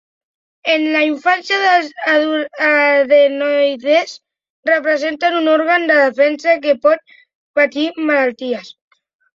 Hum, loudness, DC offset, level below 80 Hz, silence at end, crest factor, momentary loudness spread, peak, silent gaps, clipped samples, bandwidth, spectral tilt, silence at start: none; -14 LUFS; under 0.1%; -70 dBFS; 0.65 s; 14 dB; 8 LU; -2 dBFS; 4.50-4.63 s, 7.35-7.54 s; under 0.1%; 7.6 kHz; -3 dB/octave; 0.65 s